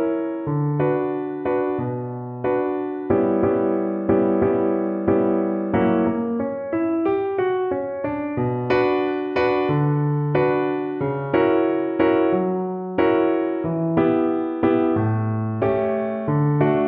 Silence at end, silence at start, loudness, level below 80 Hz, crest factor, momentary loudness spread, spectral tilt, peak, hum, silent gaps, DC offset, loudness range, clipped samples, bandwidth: 0 s; 0 s; -21 LUFS; -52 dBFS; 16 dB; 6 LU; -10.5 dB/octave; -6 dBFS; none; none; under 0.1%; 2 LU; under 0.1%; 5.4 kHz